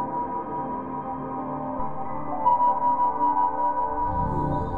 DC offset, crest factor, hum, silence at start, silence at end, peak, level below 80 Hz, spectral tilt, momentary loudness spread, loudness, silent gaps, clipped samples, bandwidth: 2%; 16 dB; none; 0 s; 0 s; -10 dBFS; -42 dBFS; -10.5 dB/octave; 10 LU; -26 LUFS; none; under 0.1%; 4 kHz